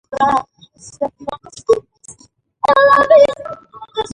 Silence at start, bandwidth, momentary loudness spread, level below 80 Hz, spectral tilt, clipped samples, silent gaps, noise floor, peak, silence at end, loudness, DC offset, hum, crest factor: 0.1 s; 11 kHz; 20 LU; -50 dBFS; -3.5 dB/octave; under 0.1%; none; -51 dBFS; 0 dBFS; 0.05 s; -14 LUFS; under 0.1%; none; 16 dB